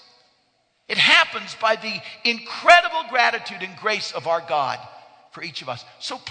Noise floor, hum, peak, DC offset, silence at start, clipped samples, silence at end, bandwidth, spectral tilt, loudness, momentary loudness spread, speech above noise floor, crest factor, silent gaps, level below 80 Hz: -66 dBFS; none; 0 dBFS; under 0.1%; 0.9 s; under 0.1%; 0 s; 9.4 kHz; -2 dB/octave; -19 LUFS; 18 LU; 44 dB; 22 dB; none; -66 dBFS